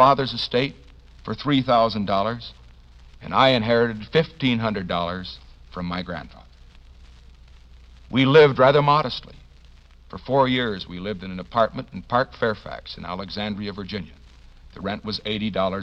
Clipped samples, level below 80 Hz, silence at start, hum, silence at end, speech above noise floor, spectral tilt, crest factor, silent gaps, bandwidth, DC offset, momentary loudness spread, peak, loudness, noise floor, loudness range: under 0.1%; -46 dBFS; 0 s; none; 0 s; 27 dB; -7 dB/octave; 22 dB; none; 7.6 kHz; under 0.1%; 18 LU; -2 dBFS; -22 LUFS; -48 dBFS; 9 LU